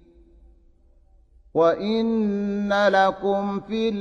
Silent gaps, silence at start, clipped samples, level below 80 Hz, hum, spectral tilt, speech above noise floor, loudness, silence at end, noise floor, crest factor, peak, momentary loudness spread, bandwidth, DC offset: none; 1.55 s; under 0.1%; -54 dBFS; none; -6.5 dB/octave; 34 dB; -22 LUFS; 0 s; -55 dBFS; 18 dB; -6 dBFS; 7 LU; 7.2 kHz; under 0.1%